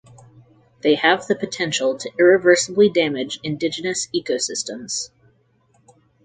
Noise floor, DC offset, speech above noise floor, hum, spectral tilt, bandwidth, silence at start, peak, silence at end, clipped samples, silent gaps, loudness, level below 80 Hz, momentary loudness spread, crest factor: -60 dBFS; under 0.1%; 41 dB; none; -3 dB/octave; 9.6 kHz; 0.85 s; 0 dBFS; 1.2 s; under 0.1%; none; -19 LUFS; -64 dBFS; 11 LU; 20 dB